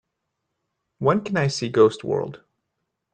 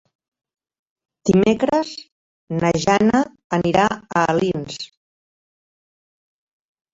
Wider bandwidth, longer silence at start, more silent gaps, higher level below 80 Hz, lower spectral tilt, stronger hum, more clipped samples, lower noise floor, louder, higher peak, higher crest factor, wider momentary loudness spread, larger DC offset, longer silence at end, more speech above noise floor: first, 9.2 kHz vs 7.8 kHz; second, 1 s vs 1.25 s; second, none vs 2.12-2.47 s, 3.44-3.50 s; second, -62 dBFS vs -50 dBFS; about the same, -6 dB/octave vs -5.5 dB/octave; neither; neither; second, -79 dBFS vs under -90 dBFS; second, -22 LUFS vs -19 LUFS; about the same, -4 dBFS vs -2 dBFS; about the same, 20 dB vs 18 dB; second, 8 LU vs 14 LU; neither; second, 0.75 s vs 2.05 s; second, 58 dB vs over 72 dB